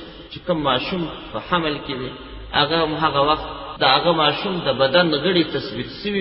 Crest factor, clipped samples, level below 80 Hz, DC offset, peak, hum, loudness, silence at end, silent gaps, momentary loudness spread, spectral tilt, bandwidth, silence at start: 18 dB; under 0.1%; -44 dBFS; under 0.1%; -2 dBFS; none; -20 LUFS; 0 s; none; 13 LU; -10 dB/octave; 5.8 kHz; 0 s